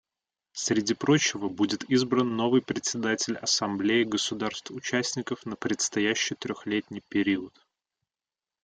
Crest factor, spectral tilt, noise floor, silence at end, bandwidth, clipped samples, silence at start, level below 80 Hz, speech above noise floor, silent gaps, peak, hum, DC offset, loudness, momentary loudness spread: 18 dB; -3.5 dB/octave; under -90 dBFS; 1.15 s; 9.4 kHz; under 0.1%; 0.55 s; -68 dBFS; over 63 dB; none; -10 dBFS; none; under 0.1%; -27 LUFS; 9 LU